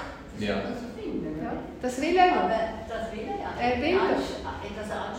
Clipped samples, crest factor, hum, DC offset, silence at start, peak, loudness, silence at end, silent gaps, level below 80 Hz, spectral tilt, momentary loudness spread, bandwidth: under 0.1%; 20 dB; none; under 0.1%; 0 s; -8 dBFS; -28 LUFS; 0 s; none; -48 dBFS; -5.5 dB/octave; 13 LU; 16 kHz